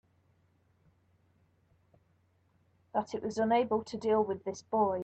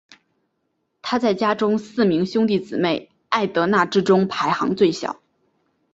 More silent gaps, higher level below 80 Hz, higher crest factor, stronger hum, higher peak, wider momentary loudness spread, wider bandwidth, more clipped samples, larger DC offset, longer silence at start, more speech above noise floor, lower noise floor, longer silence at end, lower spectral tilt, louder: neither; second, -74 dBFS vs -62 dBFS; about the same, 18 dB vs 18 dB; neither; second, -16 dBFS vs -2 dBFS; about the same, 8 LU vs 9 LU; about the same, 8.4 kHz vs 8 kHz; neither; neither; first, 2.95 s vs 1.05 s; second, 40 dB vs 53 dB; about the same, -71 dBFS vs -72 dBFS; second, 0 s vs 0.8 s; about the same, -6 dB/octave vs -6 dB/octave; second, -32 LUFS vs -20 LUFS